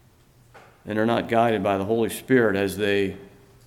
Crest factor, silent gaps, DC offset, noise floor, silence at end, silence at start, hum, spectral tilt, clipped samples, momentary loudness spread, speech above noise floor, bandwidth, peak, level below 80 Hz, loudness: 18 dB; none; under 0.1%; -55 dBFS; 0.4 s; 0.55 s; none; -5.5 dB/octave; under 0.1%; 7 LU; 33 dB; 16.5 kHz; -6 dBFS; -60 dBFS; -23 LUFS